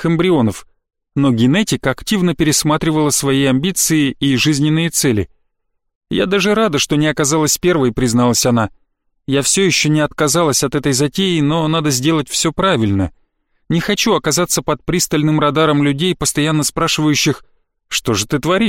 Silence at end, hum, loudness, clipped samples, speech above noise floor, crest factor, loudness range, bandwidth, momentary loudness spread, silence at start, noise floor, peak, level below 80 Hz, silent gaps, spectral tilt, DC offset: 0 s; none; -15 LUFS; under 0.1%; 54 dB; 12 dB; 2 LU; 16.5 kHz; 5 LU; 0 s; -68 dBFS; -2 dBFS; -40 dBFS; 5.95-6.01 s; -4 dB/octave; 0.1%